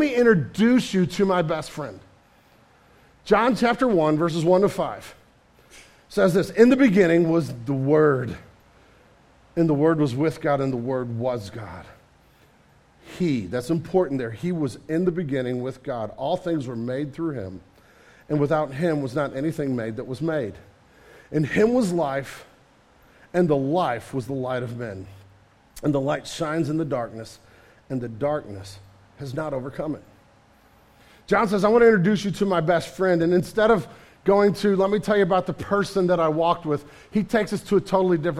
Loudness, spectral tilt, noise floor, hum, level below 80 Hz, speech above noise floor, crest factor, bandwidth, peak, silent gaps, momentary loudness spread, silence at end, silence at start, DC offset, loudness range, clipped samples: -23 LUFS; -7 dB/octave; -56 dBFS; none; -54 dBFS; 34 dB; 20 dB; 15 kHz; -2 dBFS; none; 14 LU; 0 s; 0 s; under 0.1%; 8 LU; under 0.1%